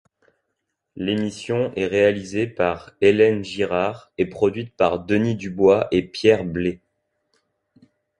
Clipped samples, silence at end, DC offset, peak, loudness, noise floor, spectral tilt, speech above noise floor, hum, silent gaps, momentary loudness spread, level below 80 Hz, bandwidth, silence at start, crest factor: under 0.1%; 1.45 s; under 0.1%; -2 dBFS; -21 LUFS; -78 dBFS; -6.5 dB/octave; 57 dB; none; none; 9 LU; -50 dBFS; 10.5 kHz; 0.95 s; 18 dB